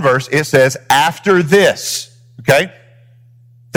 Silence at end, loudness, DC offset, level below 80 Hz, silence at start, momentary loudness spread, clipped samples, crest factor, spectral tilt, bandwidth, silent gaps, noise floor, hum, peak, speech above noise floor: 1.05 s; -13 LUFS; under 0.1%; -54 dBFS; 0 s; 11 LU; under 0.1%; 14 dB; -4 dB/octave; over 20 kHz; none; -45 dBFS; none; 0 dBFS; 33 dB